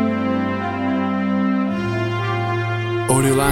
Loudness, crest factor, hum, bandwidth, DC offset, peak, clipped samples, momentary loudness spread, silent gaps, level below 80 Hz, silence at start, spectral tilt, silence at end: -20 LUFS; 16 dB; none; 16.5 kHz; under 0.1%; -2 dBFS; under 0.1%; 5 LU; none; -46 dBFS; 0 s; -5.5 dB/octave; 0 s